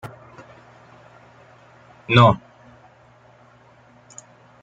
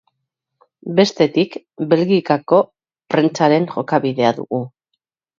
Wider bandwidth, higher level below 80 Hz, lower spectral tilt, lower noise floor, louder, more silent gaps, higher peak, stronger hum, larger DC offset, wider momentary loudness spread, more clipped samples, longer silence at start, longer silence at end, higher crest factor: about the same, 7.8 kHz vs 7.6 kHz; first, -56 dBFS vs -64 dBFS; about the same, -6.5 dB/octave vs -6.5 dB/octave; second, -52 dBFS vs -77 dBFS; about the same, -16 LUFS vs -17 LUFS; neither; about the same, -2 dBFS vs 0 dBFS; neither; neither; first, 29 LU vs 10 LU; neither; second, 0.05 s vs 0.85 s; first, 2.25 s vs 0.7 s; first, 24 dB vs 18 dB